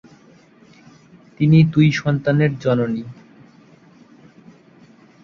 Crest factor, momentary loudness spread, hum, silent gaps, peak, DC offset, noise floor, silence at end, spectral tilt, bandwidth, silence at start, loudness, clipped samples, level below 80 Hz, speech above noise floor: 18 dB; 11 LU; none; none; -2 dBFS; under 0.1%; -49 dBFS; 2.1 s; -8 dB/octave; 6.8 kHz; 1.4 s; -17 LUFS; under 0.1%; -56 dBFS; 34 dB